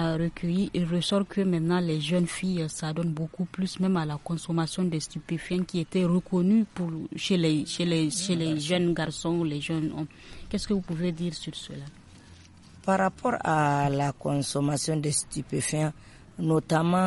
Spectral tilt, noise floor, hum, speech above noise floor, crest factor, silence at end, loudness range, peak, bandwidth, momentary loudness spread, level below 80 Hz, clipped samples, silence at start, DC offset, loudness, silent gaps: -5.5 dB/octave; -51 dBFS; none; 24 dB; 16 dB; 0 s; 4 LU; -12 dBFS; 11.5 kHz; 8 LU; -54 dBFS; under 0.1%; 0 s; under 0.1%; -28 LUFS; none